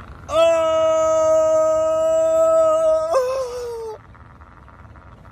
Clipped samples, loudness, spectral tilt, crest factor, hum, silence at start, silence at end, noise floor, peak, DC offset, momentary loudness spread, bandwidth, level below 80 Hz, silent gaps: under 0.1%; -17 LUFS; -4 dB/octave; 12 dB; none; 0 s; 0 s; -44 dBFS; -6 dBFS; under 0.1%; 12 LU; 12 kHz; -48 dBFS; none